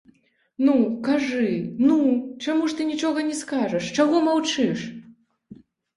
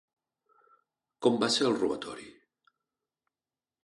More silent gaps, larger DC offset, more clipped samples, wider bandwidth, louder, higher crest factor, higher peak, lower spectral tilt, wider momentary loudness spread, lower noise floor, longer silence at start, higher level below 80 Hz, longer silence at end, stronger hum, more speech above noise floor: neither; neither; neither; about the same, 11.5 kHz vs 11.5 kHz; first, -22 LUFS vs -28 LUFS; second, 16 dB vs 22 dB; first, -6 dBFS vs -12 dBFS; about the same, -5 dB/octave vs -4 dB/octave; second, 7 LU vs 15 LU; second, -60 dBFS vs under -90 dBFS; second, 0.6 s vs 1.2 s; first, -66 dBFS vs -72 dBFS; second, 0.4 s vs 1.55 s; neither; second, 38 dB vs over 62 dB